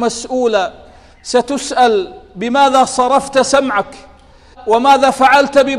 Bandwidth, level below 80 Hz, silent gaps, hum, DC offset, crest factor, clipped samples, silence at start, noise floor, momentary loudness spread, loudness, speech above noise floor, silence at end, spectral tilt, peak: 14 kHz; -46 dBFS; none; none; under 0.1%; 14 dB; under 0.1%; 0 s; -42 dBFS; 14 LU; -13 LUFS; 30 dB; 0 s; -3 dB/octave; 0 dBFS